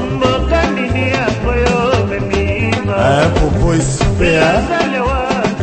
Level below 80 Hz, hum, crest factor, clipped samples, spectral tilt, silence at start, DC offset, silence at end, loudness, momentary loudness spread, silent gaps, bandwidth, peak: -22 dBFS; none; 14 dB; under 0.1%; -5.5 dB/octave; 0 s; under 0.1%; 0 s; -14 LUFS; 4 LU; none; 8.8 kHz; 0 dBFS